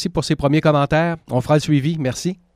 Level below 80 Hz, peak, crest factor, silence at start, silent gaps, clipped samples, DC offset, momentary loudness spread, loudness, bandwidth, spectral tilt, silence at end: -42 dBFS; -4 dBFS; 14 dB; 0 s; none; under 0.1%; under 0.1%; 7 LU; -18 LUFS; 13.5 kHz; -6.5 dB/octave; 0.2 s